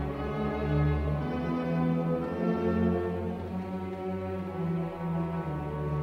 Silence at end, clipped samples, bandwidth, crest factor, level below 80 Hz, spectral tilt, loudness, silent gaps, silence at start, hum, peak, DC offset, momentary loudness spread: 0 s; under 0.1%; 6.2 kHz; 14 dB; -42 dBFS; -9.5 dB/octave; -31 LUFS; none; 0 s; none; -16 dBFS; under 0.1%; 7 LU